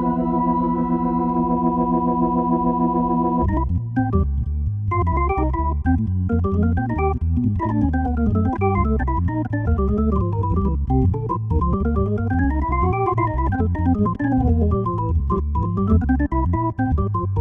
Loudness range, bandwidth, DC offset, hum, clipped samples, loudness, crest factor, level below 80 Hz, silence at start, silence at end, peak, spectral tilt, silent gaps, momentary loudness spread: 1 LU; 3.3 kHz; under 0.1%; none; under 0.1%; -21 LUFS; 14 dB; -26 dBFS; 0 s; 0 s; -6 dBFS; -12 dB/octave; none; 3 LU